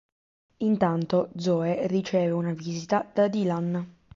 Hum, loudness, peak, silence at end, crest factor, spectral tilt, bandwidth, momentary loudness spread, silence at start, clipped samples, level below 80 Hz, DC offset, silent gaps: none; -26 LUFS; -10 dBFS; 0.25 s; 16 dB; -7.5 dB/octave; 7.6 kHz; 7 LU; 0.6 s; under 0.1%; -66 dBFS; under 0.1%; none